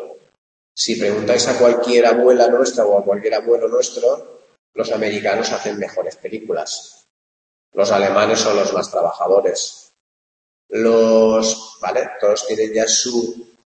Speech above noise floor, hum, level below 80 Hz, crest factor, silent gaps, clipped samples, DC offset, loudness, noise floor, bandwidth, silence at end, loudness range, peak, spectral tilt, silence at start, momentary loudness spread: over 74 dB; none; -62 dBFS; 16 dB; 0.38-0.75 s, 4.58-4.73 s, 7.10-7.72 s, 10.00-10.69 s; under 0.1%; under 0.1%; -17 LUFS; under -90 dBFS; 8.8 kHz; 0.35 s; 7 LU; -2 dBFS; -3 dB/octave; 0 s; 13 LU